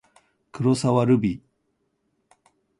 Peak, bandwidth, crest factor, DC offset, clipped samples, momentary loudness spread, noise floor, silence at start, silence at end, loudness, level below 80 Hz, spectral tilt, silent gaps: -6 dBFS; 11.5 kHz; 18 dB; under 0.1%; under 0.1%; 9 LU; -73 dBFS; 0.55 s; 1.45 s; -22 LUFS; -56 dBFS; -7 dB/octave; none